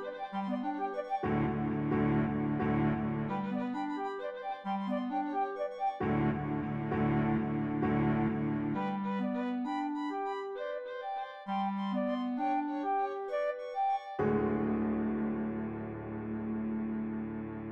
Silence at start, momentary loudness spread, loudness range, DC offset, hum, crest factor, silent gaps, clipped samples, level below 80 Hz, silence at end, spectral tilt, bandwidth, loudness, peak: 0 s; 8 LU; 3 LU; under 0.1%; none; 14 dB; none; under 0.1%; -58 dBFS; 0 s; -9 dB/octave; 7.2 kHz; -34 LUFS; -18 dBFS